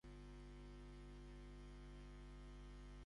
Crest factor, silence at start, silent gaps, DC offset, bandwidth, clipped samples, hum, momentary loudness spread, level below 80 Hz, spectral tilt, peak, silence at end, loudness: 8 dB; 0.05 s; none; under 0.1%; 11 kHz; under 0.1%; 50 Hz at -60 dBFS; 0 LU; -58 dBFS; -6.5 dB/octave; -48 dBFS; 0 s; -60 LUFS